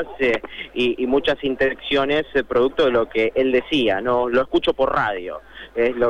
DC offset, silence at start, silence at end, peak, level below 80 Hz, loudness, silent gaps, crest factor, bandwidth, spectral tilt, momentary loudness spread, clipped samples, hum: under 0.1%; 0 s; 0 s; -6 dBFS; -46 dBFS; -20 LUFS; none; 14 dB; 9.8 kHz; -6 dB/octave; 6 LU; under 0.1%; none